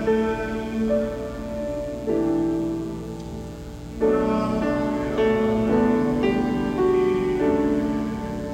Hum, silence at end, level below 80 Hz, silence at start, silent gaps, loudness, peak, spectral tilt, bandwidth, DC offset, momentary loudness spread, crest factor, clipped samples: 60 Hz at -40 dBFS; 0 s; -40 dBFS; 0 s; none; -23 LUFS; -8 dBFS; -7.5 dB/octave; 16 kHz; under 0.1%; 11 LU; 14 dB; under 0.1%